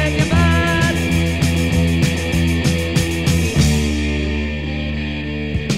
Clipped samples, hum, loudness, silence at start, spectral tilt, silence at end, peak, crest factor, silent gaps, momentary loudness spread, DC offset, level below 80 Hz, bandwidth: under 0.1%; none; -17 LUFS; 0 s; -5.5 dB/octave; 0 s; -2 dBFS; 16 dB; none; 8 LU; 1%; -24 dBFS; 16 kHz